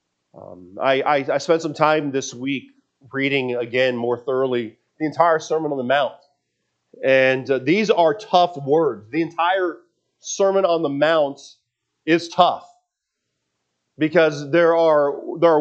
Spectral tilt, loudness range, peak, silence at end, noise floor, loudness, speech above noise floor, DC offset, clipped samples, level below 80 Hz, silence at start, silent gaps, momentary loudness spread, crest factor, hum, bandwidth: -5 dB/octave; 3 LU; 0 dBFS; 0 s; -79 dBFS; -19 LUFS; 60 dB; under 0.1%; under 0.1%; -76 dBFS; 0.35 s; none; 10 LU; 20 dB; none; 8.2 kHz